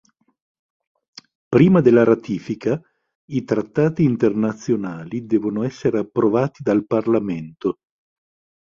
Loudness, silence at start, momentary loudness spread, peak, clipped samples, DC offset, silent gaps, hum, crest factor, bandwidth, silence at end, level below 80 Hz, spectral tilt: -20 LUFS; 1.5 s; 13 LU; -2 dBFS; under 0.1%; under 0.1%; 3.15-3.28 s; none; 18 dB; 7.2 kHz; 0.95 s; -56 dBFS; -8.5 dB/octave